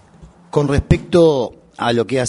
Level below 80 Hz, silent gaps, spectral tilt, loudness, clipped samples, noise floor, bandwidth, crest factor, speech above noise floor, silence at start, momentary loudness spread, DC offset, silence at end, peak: -30 dBFS; none; -6.5 dB/octave; -16 LUFS; under 0.1%; -44 dBFS; 11 kHz; 16 dB; 29 dB; 0.2 s; 9 LU; under 0.1%; 0 s; 0 dBFS